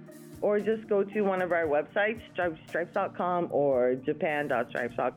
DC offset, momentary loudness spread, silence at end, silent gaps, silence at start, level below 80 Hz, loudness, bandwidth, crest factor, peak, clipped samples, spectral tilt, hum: under 0.1%; 6 LU; 0 s; none; 0 s; -66 dBFS; -29 LUFS; 15.5 kHz; 12 dB; -16 dBFS; under 0.1%; -7 dB/octave; none